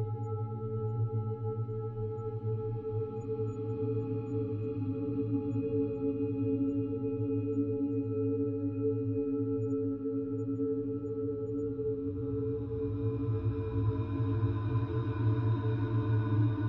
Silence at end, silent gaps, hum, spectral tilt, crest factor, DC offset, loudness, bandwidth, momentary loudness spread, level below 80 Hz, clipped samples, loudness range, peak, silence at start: 0 s; none; none; -11.5 dB/octave; 14 dB; under 0.1%; -34 LUFS; 4.1 kHz; 5 LU; -54 dBFS; under 0.1%; 3 LU; -20 dBFS; 0 s